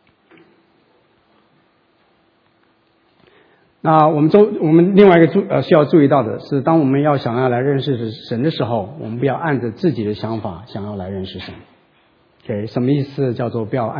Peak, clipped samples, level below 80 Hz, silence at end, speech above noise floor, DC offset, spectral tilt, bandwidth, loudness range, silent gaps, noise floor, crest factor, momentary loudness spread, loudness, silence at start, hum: 0 dBFS; under 0.1%; -56 dBFS; 0 s; 43 dB; under 0.1%; -10 dB/octave; 5.4 kHz; 11 LU; none; -58 dBFS; 18 dB; 15 LU; -16 LUFS; 3.85 s; none